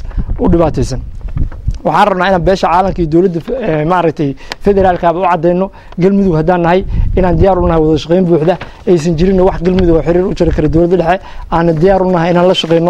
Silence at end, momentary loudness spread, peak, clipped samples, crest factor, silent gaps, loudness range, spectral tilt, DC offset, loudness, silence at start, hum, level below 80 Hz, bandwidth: 0 s; 8 LU; 0 dBFS; under 0.1%; 10 dB; none; 2 LU; -7.5 dB/octave; under 0.1%; -11 LUFS; 0 s; none; -22 dBFS; 9.8 kHz